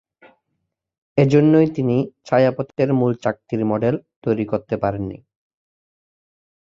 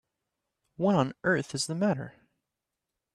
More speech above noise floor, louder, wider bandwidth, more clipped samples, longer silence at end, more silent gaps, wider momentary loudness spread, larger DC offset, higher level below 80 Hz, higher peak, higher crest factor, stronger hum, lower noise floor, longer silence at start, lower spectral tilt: about the same, 57 dB vs 59 dB; first, -19 LUFS vs -29 LUFS; second, 7.6 kHz vs 13 kHz; neither; first, 1.5 s vs 1.05 s; first, 4.16-4.22 s vs none; first, 10 LU vs 7 LU; neither; first, -54 dBFS vs -70 dBFS; first, -2 dBFS vs -12 dBFS; about the same, 18 dB vs 20 dB; neither; second, -76 dBFS vs -87 dBFS; first, 1.15 s vs 0.8 s; first, -9 dB/octave vs -5 dB/octave